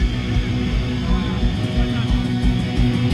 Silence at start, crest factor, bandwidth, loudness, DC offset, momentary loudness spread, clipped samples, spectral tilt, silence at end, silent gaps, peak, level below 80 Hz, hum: 0 s; 14 dB; 10.5 kHz; -21 LUFS; under 0.1%; 2 LU; under 0.1%; -7 dB/octave; 0 s; none; -4 dBFS; -22 dBFS; none